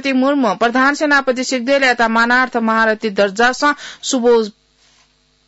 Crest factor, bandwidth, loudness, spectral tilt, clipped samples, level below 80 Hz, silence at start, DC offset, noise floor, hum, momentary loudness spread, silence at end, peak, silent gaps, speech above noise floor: 12 dB; 8 kHz; -14 LUFS; -3 dB/octave; under 0.1%; -54 dBFS; 0.05 s; under 0.1%; -56 dBFS; none; 5 LU; 0.95 s; -4 dBFS; none; 42 dB